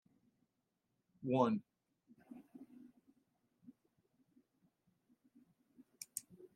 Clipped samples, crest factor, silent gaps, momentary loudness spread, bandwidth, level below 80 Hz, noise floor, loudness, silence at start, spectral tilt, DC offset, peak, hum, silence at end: under 0.1%; 28 dB; none; 25 LU; 15.5 kHz; under -90 dBFS; -86 dBFS; -39 LUFS; 1.2 s; -6 dB/octave; under 0.1%; -18 dBFS; none; 0.1 s